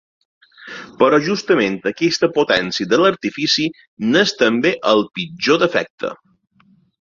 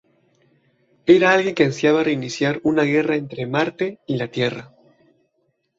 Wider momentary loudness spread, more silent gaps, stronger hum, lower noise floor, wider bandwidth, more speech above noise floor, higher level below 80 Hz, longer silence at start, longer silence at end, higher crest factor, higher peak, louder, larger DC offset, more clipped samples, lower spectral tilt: about the same, 11 LU vs 11 LU; first, 3.87-3.97 s, 5.90-5.98 s vs none; neither; second, -55 dBFS vs -69 dBFS; about the same, 7.6 kHz vs 7.8 kHz; second, 39 dB vs 50 dB; about the same, -58 dBFS vs -60 dBFS; second, 0.6 s vs 1.05 s; second, 0.85 s vs 1.15 s; about the same, 16 dB vs 20 dB; about the same, -2 dBFS vs -2 dBFS; about the same, -17 LUFS vs -19 LUFS; neither; neither; second, -4 dB/octave vs -6 dB/octave